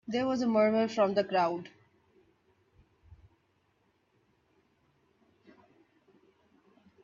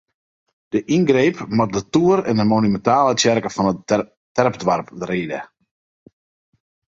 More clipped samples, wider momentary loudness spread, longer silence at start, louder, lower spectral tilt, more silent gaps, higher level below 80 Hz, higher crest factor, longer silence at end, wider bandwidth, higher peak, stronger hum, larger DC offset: neither; about the same, 10 LU vs 9 LU; second, 0.05 s vs 0.75 s; second, -29 LUFS vs -19 LUFS; about the same, -6 dB/octave vs -5.5 dB/octave; second, none vs 4.17-4.35 s; second, -72 dBFS vs -54 dBFS; about the same, 20 dB vs 18 dB; first, 3.9 s vs 1.45 s; about the same, 7.4 kHz vs 8 kHz; second, -16 dBFS vs 0 dBFS; neither; neither